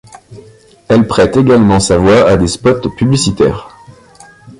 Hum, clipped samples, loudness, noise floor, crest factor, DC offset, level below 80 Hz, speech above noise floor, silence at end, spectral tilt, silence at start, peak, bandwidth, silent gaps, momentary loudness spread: none; under 0.1%; -10 LUFS; -40 dBFS; 12 dB; under 0.1%; -32 dBFS; 30 dB; 0.1 s; -5.5 dB/octave; 0.3 s; 0 dBFS; 11.5 kHz; none; 6 LU